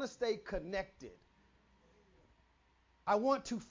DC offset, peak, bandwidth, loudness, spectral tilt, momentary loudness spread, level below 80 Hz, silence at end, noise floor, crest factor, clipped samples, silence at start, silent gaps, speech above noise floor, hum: under 0.1%; -20 dBFS; 7.6 kHz; -37 LUFS; -4.5 dB/octave; 18 LU; -62 dBFS; 0.05 s; -72 dBFS; 20 dB; under 0.1%; 0 s; none; 34 dB; none